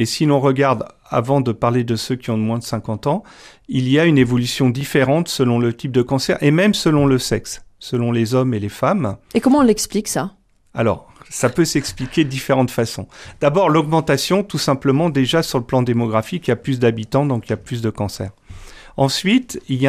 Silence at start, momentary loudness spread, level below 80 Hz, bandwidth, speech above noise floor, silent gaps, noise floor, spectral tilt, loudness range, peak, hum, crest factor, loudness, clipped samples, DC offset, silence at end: 0 s; 9 LU; -46 dBFS; 15.5 kHz; 20 dB; none; -37 dBFS; -5.5 dB/octave; 4 LU; -2 dBFS; none; 16 dB; -18 LUFS; under 0.1%; under 0.1%; 0 s